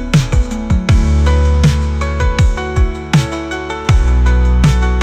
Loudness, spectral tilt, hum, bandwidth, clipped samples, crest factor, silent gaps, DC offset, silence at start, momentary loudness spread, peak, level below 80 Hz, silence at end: -14 LUFS; -6.5 dB/octave; none; 9.8 kHz; under 0.1%; 10 dB; none; under 0.1%; 0 s; 5 LU; -2 dBFS; -14 dBFS; 0 s